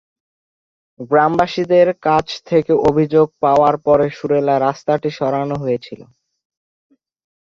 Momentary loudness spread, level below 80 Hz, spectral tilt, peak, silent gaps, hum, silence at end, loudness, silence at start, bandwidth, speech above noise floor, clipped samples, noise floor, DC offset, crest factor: 7 LU; -50 dBFS; -7 dB/octave; -2 dBFS; none; none; 1.55 s; -16 LUFS; 1 s; 7.4 kHz; over 75 dB; under 0.1%; under -90 dBFS; under 0.1%; 16 dB